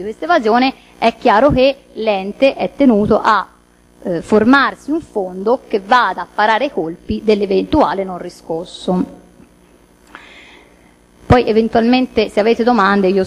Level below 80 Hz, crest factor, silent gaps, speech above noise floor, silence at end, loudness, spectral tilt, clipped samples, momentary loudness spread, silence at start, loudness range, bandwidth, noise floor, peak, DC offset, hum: -38 dBFS; 14 dB; none; 34 dB; 0 s; -14 LUFS; -6.5 dB/octave; under 0.1%; 11 LU; 0 s; 6 LU; 12.5 kHz; -48 dBFS; 0 dBFS; under 0.1%; 60 Hz at -45 dBFS